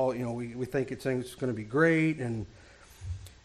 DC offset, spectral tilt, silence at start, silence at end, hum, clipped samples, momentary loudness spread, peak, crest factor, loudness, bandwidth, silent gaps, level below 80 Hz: under 0.1%; -7 dB/octave; 0 s; 0.1 s; none; under 0.1%; 17 LU; -12 dBFS; 18 dB; -30 LUFS; 14 kHz; none; -54 dBFS